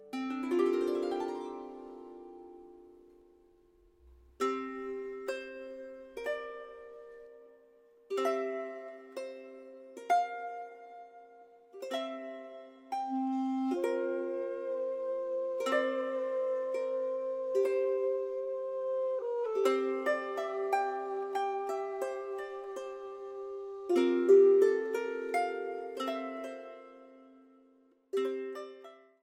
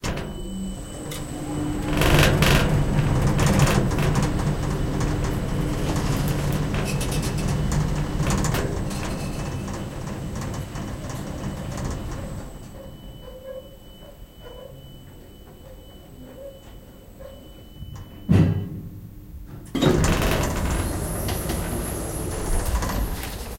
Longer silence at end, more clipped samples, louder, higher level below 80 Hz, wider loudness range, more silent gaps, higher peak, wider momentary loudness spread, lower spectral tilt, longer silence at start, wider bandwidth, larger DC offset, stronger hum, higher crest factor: first, 0.25 s vs 0 s; neither; second, -33 LUFS vs -24 LUFS; second, -76 dBFS vs -30 dBFS; second, 12 LU vs 22 LU; neither; second, -14 dBFS vs -4 dBFS; second, 19 LU vs 24 LU; second, -3.5 dB/octave vs -5.5 dB/octave; about the same, 0 s vs 0 s; about the same, 15.5 kHz vs 17 kHz; neither; neither; about the same, 20 dB vs 22 dB